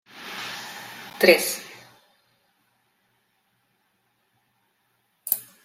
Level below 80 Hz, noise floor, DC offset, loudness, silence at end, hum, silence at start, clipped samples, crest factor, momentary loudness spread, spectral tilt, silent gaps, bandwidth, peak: -72 dBFS; -70 dBFS; under 0.1%; -23 LUFS; 0.2 s; none; 0.15 s; under 0.1%; 28 dB; 22 LU; -2.5 dB/octave; none; 16.5 kHz; -2 dBFS